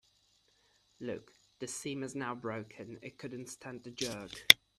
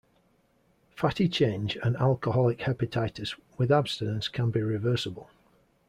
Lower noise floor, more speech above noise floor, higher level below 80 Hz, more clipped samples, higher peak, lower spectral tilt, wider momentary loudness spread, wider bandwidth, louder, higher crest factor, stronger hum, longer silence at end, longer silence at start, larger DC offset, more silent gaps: first, -71 dBFS vs -67 dBFS; about the same, 37 dB vs 40 dB; second, -72 dBFS vs -58 dBFS; neither; first, 0 dBFS vs -10 dBFS; second, -1.5 dB/octave vs -7 dB/octave; first, 11 LU vs 7 LU; first, 14.5 kHz vs 11.5 kHz; second, -34 LUFS vs -28 LUFS; first, 36 dB vs 18 dB; neither; second, 0.25 s vs 0.65 s; about the same, 1 s vs 0.95 s; neither; neither